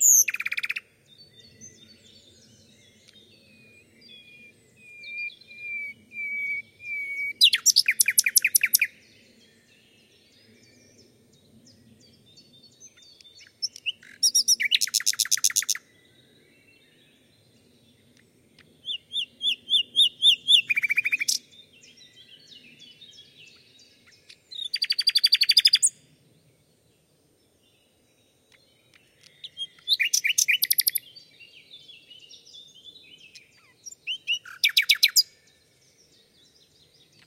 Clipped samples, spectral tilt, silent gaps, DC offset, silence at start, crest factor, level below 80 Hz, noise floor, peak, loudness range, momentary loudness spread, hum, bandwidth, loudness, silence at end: under 0.1%; 4 dB/octave; none; under 0.1%; 0 s; 26 dB; -80 dBFS; -64 dBFS; -2 dBFS; 17 LU; 18 LU; none; 16.5 kHz; -21 LUFS; 2.05 s